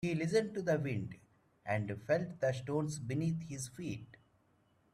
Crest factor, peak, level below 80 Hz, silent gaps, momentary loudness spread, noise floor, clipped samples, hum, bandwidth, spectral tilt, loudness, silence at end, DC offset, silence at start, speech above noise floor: 18 dB; -18 dBFS; -68 dBFS; none; 11 LU; -72 dBFS; under 0.1%; none; 14 kHz; -6.5 dB/octave; -37 LUFS; 0.9 s; under 0.1%; 0 s; 36 dB